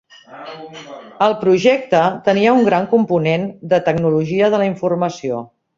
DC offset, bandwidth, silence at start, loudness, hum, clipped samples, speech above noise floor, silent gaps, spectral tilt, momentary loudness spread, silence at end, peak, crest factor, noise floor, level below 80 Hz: under 0.1%; 7.6 kHz; 0.3 s; -16 LUFS; none; under 0.1%; 20 dB; none; -6.5 dB/octave; 20 LU; 0.35 s; -2 dBFS; 14 dB; -36 dBFS; -56 dBFS